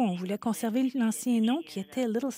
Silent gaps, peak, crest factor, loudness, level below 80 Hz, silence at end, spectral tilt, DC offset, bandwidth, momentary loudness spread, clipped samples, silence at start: none; -18 dBFS; 10 dB; -29 LUFS; -80 dBFS; 0 s; -5.5 dB/octave; under 0.1%; 16 kHz; 5 LU; under 0.1%; 0 s